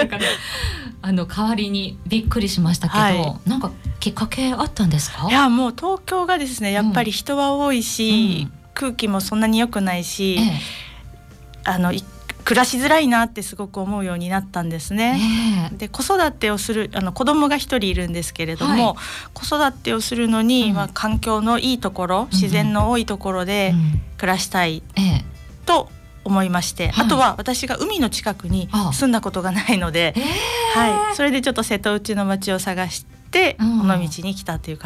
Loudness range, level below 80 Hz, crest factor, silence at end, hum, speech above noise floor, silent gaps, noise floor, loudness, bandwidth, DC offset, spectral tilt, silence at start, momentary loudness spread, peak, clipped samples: 2 LU; -36 dBFS; 14 dB; 0 s; none; 21 dB; none; -41 dBFS; -20 LUFS; 15.5 kHz; under 0.1%; -4.5 dB/octave; 0 s; 9 LU; -6 dBFS; under 0.1%